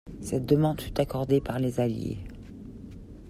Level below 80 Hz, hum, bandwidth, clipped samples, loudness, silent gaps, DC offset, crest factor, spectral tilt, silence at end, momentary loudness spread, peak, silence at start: -46 dBFS; none; 15 kHz; under 0.1%; -28 LUFS; none; under 0.1%; 20 dB; -7.5 dB/octave; 0 s; 20 LU; -10 dBFS; 0.05 s